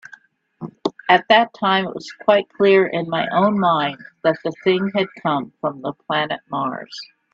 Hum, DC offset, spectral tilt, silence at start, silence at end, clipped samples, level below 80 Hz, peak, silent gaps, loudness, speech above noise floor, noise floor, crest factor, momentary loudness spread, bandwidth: none; under 0.1%; -6 dB/octave; 0.6 s; 0.3 s; under 0.1%; -66 dBFS; 0 dBFS; none; -19 LUFS; 29 dB; -48 dBFS; 20 dB; 13 LU; 7.6 kHz